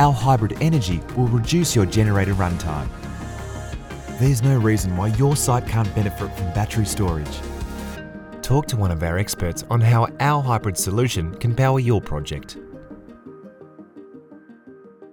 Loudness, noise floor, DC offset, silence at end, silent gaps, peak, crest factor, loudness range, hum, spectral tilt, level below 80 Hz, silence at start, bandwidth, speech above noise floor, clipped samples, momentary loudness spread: -21 LUFS; -45 dBFS; under 0.1%; 0.05 s; none; -4 dBFS; 18 dB; 4 LU; none; -6 dB/octave; -36 dBFS; 0 s; 19 kHz; 26 dB; under 0.1%; 15 LU